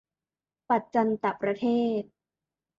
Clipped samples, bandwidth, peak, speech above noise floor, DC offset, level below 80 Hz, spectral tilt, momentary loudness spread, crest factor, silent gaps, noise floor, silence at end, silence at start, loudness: under 0.1%; 7.2 kHz; -12 dBFS; over 64 dB; under 0.1%; -74 dBFS; -7.5 dB/octave; 6 LU; 18 dB; none; under -90 dBFS; 0.75 s; 0.7 s; -27 LUFS